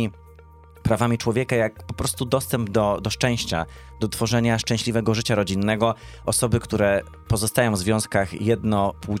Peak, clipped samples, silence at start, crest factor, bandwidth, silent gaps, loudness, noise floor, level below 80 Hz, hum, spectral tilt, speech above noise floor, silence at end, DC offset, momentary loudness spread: -6 dBFS; under 0.1%; 0 s; 18 dB; 16 kHz; none; -23 LUFS; -47 dBFS; -44 dBFS; none; -5 dB/octave; 25 dB; 0 s; under 0.1%; 6 LU